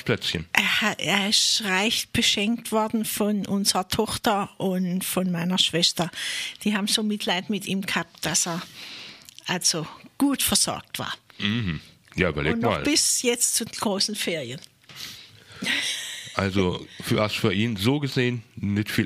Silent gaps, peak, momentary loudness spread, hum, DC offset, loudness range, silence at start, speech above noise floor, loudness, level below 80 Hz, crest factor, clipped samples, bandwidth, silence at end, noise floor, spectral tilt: none; -2 dBFS; 12 LU; none; under 0.1%; 4 LU; 0 s; 21 dB; -23 LUFS; -52 dBFS; 24 dB; under 0.1%; 15.5 kHz; 0 s; -45 dBFS; -3 dB/octave